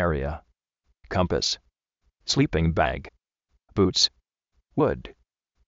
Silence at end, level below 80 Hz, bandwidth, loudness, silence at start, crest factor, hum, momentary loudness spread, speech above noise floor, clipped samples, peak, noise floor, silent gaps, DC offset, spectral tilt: 0.55 s; -42 dBFS; 8 kHz; -25 LUFS; 0 s; 20 dB; none; 13 LU; 49 dB; under 0.1%; -8 dBFS; -73 dBFS; none; under 0.1%; -4 dB/octave